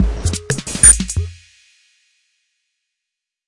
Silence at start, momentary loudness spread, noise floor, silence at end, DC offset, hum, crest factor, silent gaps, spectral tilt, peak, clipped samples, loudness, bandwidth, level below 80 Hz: 0 s; 16 LU; -82 dBFS; 2.15 s; under 0.1%; none; 18 dB; none; -2.5 dB/octave; 0 dBFS; 0.2%; -12 LUFS; 12 kHz; -28 dBFS